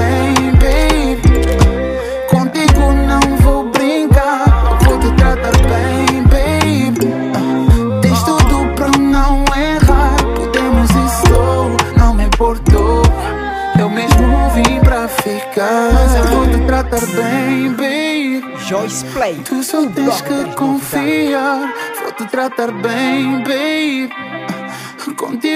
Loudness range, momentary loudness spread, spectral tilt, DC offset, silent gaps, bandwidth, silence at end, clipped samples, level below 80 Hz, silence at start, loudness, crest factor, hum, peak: 5 LU; 8 LU; -6 dB/octave; under 0.1%; none; 16 kHz; 0 s; under 0.1%; -16 dBFS; 0 s; -13 LUFS; 12 dB; none; 0 dBFS